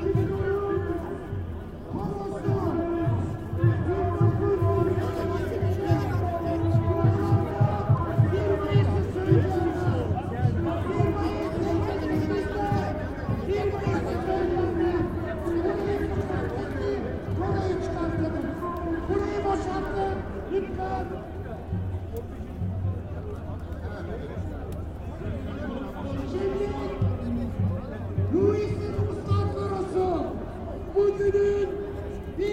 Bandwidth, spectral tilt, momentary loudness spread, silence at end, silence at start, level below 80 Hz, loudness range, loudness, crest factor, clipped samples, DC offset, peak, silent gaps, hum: 9.4 kHz; -8.5 dB/octave; 11 LU; 0 s; 0 s; -40 dBFS; 9 LU; -27 LUFS; 20 dB; under 0.1%; under 0.1%; -6 dBFS; none; none